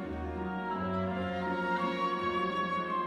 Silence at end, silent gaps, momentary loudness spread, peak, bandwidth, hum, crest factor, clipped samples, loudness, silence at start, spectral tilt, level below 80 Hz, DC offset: 0 s; none; 5 LU; -20 dBFS; 11 kHz; none; 12 dB; under 0.1%; -33 LUFS; 0 s; -7 dB/octave; -52 dBFS; under 0.1%